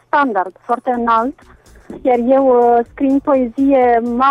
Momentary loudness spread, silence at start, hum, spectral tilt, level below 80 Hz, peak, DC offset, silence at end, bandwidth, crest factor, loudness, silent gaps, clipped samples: 9 LU; 0.15 s; none; -7 dB/octave; -46 dBFS; -2 dBFS; under 0.1%; 0 s; 6.6 kHz; 14 dB; -14 LUFS; none; under 0.1%